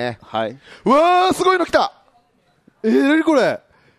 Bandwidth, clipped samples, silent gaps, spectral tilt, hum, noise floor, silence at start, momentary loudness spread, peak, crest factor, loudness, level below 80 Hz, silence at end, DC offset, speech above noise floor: 13.5 kHz; under 0.1%; none; -4.5 dB/octave; none; -60 dBFS; 0 s; 11 LU; -2 dBFS; 16 dB; -17 LUFS; -56 dBFS; 0.4 s; under 0.1%; 43 dB